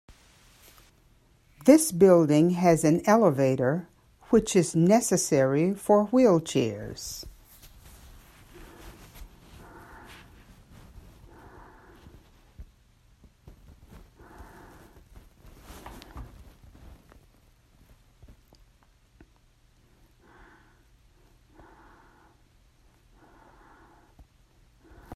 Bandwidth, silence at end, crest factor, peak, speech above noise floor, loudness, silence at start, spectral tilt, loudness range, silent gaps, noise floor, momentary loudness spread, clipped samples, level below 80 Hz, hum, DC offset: 15 kHz; 0 s; 24 dB; -4 dBFS; 40 dB; -23 LUFS; 1.65 s; -6 dB/octave; 14 LU; none; -61 dBFS; 29 LU; under 0.1%; -54 dBFS; none; under 0.1%